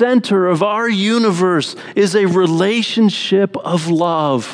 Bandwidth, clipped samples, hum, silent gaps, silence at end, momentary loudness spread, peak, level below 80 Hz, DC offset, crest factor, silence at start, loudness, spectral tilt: 10.5 kHz; under 0.1%; none; none; 0 s; 4 LU; -2 dBFS; -70 dBFS; under 0.1%; 14 dB; 0 s; -15 LUFS; -5.5 dB/octave